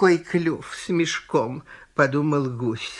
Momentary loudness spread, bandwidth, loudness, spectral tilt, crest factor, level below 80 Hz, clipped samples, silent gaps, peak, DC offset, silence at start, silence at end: 10 LU; 11 kHz; -24 LUFS; -5.5 dB/octave; 20 dB; -60 dBFS; under 0.1%; none; -4 dBFS; under 0.1%; 0 s; 0 s